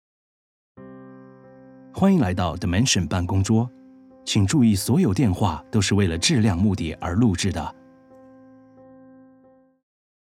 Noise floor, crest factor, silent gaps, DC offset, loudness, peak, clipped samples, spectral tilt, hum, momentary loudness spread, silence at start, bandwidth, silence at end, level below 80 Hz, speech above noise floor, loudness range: -55 dBFS; 18 dB; none; under 0.1%; -21 LUFS; -6 dBFS; under 0.1%; -5 dB/octave; none; 12 LU; 0.8 s; 15 kHz; 2.65 s; -44 dBFS; 35 dB; 6 LU